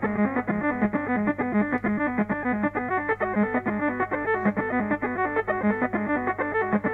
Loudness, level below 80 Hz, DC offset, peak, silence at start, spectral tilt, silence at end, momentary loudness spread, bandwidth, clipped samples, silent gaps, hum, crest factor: -25 LUFS; -54 dBFS; under 0.1%; -10 dBFS; 0 s; -9.5 dB/octave; 0 s; 2 LU; 4 kHz; under 0.1%; none; 50 Hz at -45 dBFS; 16 dB